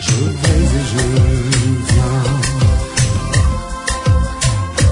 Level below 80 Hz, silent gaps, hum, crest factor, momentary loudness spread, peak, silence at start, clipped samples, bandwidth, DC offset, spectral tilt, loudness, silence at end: -20 dBFS; none; none; 12 dB; 3 LU; -2 dBFS; 0 s; under 0.1%; 11 kHz; under 0.1%; -5 dB/octave; -15 LUFS; 0 s